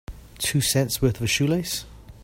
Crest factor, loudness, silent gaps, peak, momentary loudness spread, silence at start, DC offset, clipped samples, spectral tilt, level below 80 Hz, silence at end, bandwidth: 18 dB; -23 LUFS; none; -6 dBFS; 9 LU; 0.1 s; under 0.1%; under 0.1%; -4 dB/octave; -42 dBFS; 0 s; 16.5 kHz